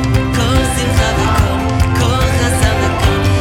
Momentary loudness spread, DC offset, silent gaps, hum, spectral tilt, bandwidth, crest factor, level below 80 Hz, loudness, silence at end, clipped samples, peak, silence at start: 1 LU; under 0.1%; none; none; -5 dB/octave; 17 kHz; 12 dB; -20 dBFS; -14 LUFS; 0 s; under 0.1%; 0 dBFS; 0 s